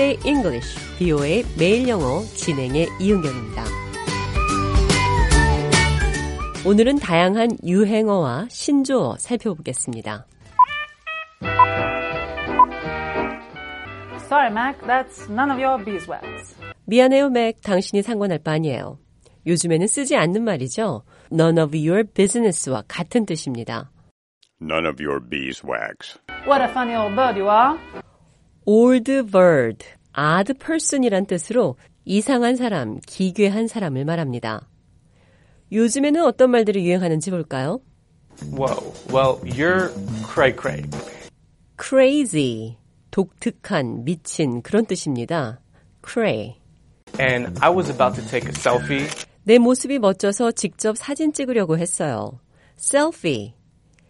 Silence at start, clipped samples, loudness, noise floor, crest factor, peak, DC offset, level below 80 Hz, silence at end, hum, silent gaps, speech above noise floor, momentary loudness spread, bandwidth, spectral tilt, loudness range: 0 s; under 0.1%; -20 LUFS; -56 dBFS; 20 dB; -2 dBFS; under 0.1%; -34 dBFS; 0.6 s; none; 24.11-24.41 s, 47.03-47.07 s; 36 dB; 14 LU; 11.5 kHz; -5 dB/octave; 5 LU